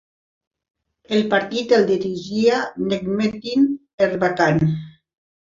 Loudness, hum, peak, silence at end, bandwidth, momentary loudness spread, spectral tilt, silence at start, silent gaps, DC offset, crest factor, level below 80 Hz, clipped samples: -20 LUFS; none; -2 dBFS; 0.7 s; 7.6 kHz; 6 LU; -6.5 dB/octave; 1.1 s; 3.93-3.98 s; under 0.1%; 18 dB; -54 dBFS; under 0.1%